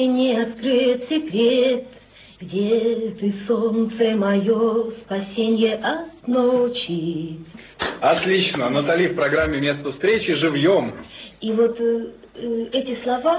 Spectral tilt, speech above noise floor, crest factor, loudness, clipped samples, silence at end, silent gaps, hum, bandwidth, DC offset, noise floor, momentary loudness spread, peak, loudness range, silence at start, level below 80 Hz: -10 dB/octave; 26 dB; 16 dB; -21 LUFS; under 0.1%; 0 s; none; none; 4 kHz; under 0.1%; -46 dBFS; 10 LU; -6 dBFS; 2 LU; 0 s; -50 dBFS